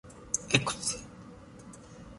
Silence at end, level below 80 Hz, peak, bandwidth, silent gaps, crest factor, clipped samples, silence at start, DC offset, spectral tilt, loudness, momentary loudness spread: 0 s; -56 dBFS; -8 dBFS; 11.5 kHz; none; 28 dB; under 0.1%; 0.05 s; under 0.1%; -2.5 dB/octave; -30 LUFS; 23 LU